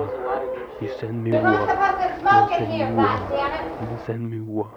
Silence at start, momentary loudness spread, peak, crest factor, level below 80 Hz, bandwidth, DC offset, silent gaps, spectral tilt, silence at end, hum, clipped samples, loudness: 0 s; 13 LU; -6 dBFS; 16 dB; -48 dBFS; 7.4 kHz; under 0.1%; none; -7.5 dB/octave; 0 s; none; under 0.1%; -22 LUFS